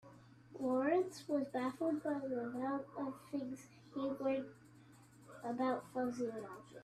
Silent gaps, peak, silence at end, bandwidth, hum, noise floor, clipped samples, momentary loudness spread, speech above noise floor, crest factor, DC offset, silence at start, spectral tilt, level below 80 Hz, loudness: none; -24 dBFS; 0 s; 14 kHz; none; -62 dBFS; under 0.1%; 13 LU; 22 dB; 18 dB; under 0.1%; 0.05 s; -6 dB/octave; -80 dBFS; -40 LUFS